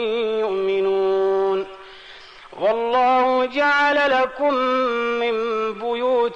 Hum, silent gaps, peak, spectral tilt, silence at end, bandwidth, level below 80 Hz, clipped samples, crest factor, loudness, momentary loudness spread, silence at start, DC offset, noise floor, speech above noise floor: none; none; -10 dBFS; -4.5 dB/octave; 0 s; 8.2 kHz; -58 dBFS; under 0.1%; 10 dB; -20 LUFS; 11 LU; 0 s; under 0.1%; -42 dBFS; 23 dB